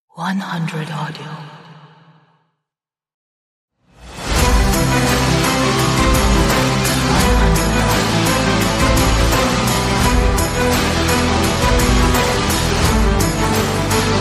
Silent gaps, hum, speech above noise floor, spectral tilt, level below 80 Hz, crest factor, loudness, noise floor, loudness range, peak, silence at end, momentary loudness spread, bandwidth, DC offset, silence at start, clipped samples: 3.14-3.68 s; none; 65 dB; -4.5 dB/octave; -22 dBFS; 14 dB; -15 LUFS; -88 dBFS; 12 LU; -2 dBFS; 0 s; 8 LU; 15.5 kHz; under 0.1%; 0.15 s; under 0.1%